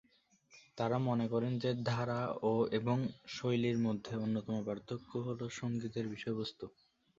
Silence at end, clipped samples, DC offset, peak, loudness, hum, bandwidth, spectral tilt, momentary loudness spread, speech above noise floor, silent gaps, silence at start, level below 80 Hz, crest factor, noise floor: 0.5 s; under 0.1%; under 0.1%; -20 dBFS; -37 LUFS; none; 7.6 kHz; -6.5 dB/octave; 8 LU; 34 dB; none; 0.55 s; -70 dBFS; 16 dB; -70 dBFS